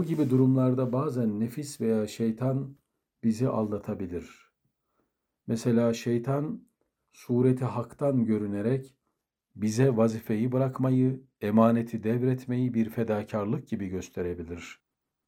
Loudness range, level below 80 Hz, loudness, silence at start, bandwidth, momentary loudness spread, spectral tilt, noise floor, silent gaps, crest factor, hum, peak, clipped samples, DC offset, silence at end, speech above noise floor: 5 LU; -66 dBFS; -28 LUFS; 0 s; 14.5 kHz; 11 LU; -8 dB/octave; -81 dBFS; none; 20 dB; none; -8 dBFS; under 0.1%; under 0.1%; 0.55 s; 54 dB